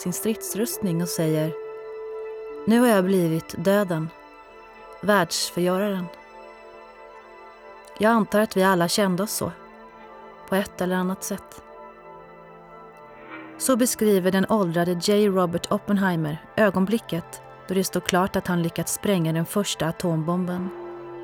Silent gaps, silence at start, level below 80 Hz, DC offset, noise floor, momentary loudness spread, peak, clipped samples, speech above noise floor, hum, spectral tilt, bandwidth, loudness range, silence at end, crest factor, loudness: none; 0 s; -58 dBFS; under 0.1%; -46 dBFS; 24 LU; -2 dBFS; under 0.1%; 23 dB; none; -5 dB/octave; 19 kHz; 6 LU; 0 s; 24 dB; -23 LUFS